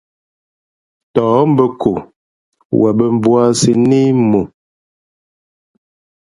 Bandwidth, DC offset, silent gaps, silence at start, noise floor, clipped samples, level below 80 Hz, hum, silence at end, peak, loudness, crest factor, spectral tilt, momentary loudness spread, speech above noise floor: 11.5 kHz; under 0.1%; 2.16-2.52 s, 2.65-2.70 s; 1.15 s; under -90 dBFS; under 0.1%; -50 dBFS; none; 1.85 s; 0 dBFS; -13 LUFS; 14 dB; -6.5 dB/octave; 8 LU; over 78 dB